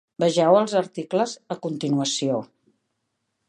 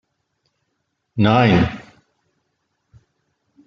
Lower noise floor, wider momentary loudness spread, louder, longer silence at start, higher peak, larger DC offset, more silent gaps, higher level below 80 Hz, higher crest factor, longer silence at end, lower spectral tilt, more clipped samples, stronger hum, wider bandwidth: first, -77 dBFS vs -73 dBFS; second, 11 LU vs 18 LU; second, -23 LUFS vs -16 LUFS; second, 0.2 s vs 1.15 s; about the same, -4 dBFS vs -2 dBFS; neither; neither; second, -74 dBFS vs -46 dBFS; about the same, 20 dB vs 20 dB; second, 1.05 s vs 1.85 s; second, -5 dB/octave vs -8 dB/octave; neither; neither; first, 11 kHz vs 7.2 kHz